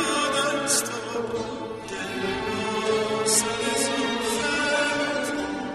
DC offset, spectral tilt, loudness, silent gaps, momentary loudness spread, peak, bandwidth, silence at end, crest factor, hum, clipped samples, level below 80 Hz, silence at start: under 0.1%; -2 dB/octave; -25 LUFS; none; 9 LU; -8 dBFS; 13 kHz; 0 s; 18 dB; none; under 0.1%; -54 dBFS; 0 s